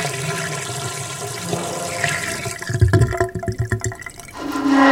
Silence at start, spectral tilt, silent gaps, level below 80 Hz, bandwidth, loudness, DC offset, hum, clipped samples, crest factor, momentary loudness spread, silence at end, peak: 0 s; -5 dB/octave; none; -36 dBFS; 16.5 kHz; -22 LUFS; under 0.1%; none; under 0.1%; 20 dB; 10 LU; 0 s; -2 dBFS